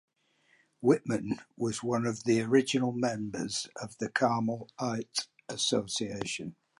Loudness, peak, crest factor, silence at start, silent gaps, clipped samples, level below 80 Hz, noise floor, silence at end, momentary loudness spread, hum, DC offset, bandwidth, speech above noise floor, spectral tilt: -31 LUFS; -12 dBFS; 20 dB; 0.8 s; none; under 0.1%; -68 dBFS; -69 dBFS; 0.3 s; 9 LU; none; under 0.1%; 11.5 kHz; 39 dB; -4.5 dB/octave